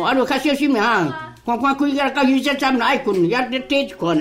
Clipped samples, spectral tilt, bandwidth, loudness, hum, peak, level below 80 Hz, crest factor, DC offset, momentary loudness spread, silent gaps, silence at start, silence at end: under 0.1%; -5 dB/octave; 16 kHz; -18 LUFS; none; -6 dBFS; -52 dBFS; 12 dB; under 0.1%; 4 LU; none; 0 s; 0 s